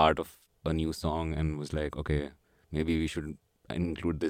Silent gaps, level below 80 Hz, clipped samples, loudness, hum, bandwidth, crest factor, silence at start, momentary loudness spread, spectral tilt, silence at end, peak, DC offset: none; -42 dBFS; under 0.1%; -33 LUFS; none; 16 kHz; 22 dB; 0 s; 10 LU; -6.5 dB/octave; 0 s; -10 dBFS; under 0.1%